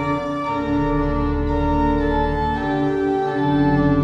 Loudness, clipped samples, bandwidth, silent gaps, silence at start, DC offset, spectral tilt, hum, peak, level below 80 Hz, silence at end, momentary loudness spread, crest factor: -20 LUFS; under 0.1%; 7.4 kHz; none; 0 s; under 0.1%; -8.5 dB/octave; none; -6 dBFS; -28 dBFS; 0 s; 5 LU; 12 dB